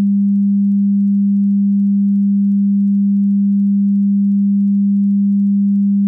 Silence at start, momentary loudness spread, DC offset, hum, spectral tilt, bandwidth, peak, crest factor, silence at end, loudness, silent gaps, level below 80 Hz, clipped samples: 0 s; 0 LU; under 0.1%; none; -14.5 dB/octave; 0.3 kHz; -10 dBFS; 4 dB; 0 s; -14 LUFS; none; -72 dBFS; under 0.1%